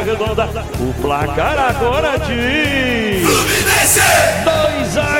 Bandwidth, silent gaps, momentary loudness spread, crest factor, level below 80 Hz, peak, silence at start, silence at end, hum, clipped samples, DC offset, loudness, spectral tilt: 17 kHz; none; 9 LU; 14 dB; -28 dBFS; 0 dBFS; 0 s; 0 s; none; under 0.1%; 0.3%; -14 LUFS; -3 dB/octave